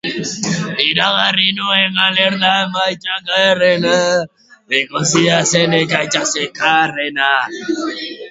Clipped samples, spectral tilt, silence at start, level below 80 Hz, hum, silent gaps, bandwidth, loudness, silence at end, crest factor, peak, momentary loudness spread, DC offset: under 0.1%; -3 dB/octave; 0.05 s; -58 dBFS; none; none; 8 kHz; -14 LUFS; 0 s; 16 dB; 0 dBFS; 9 LU; under 0.1%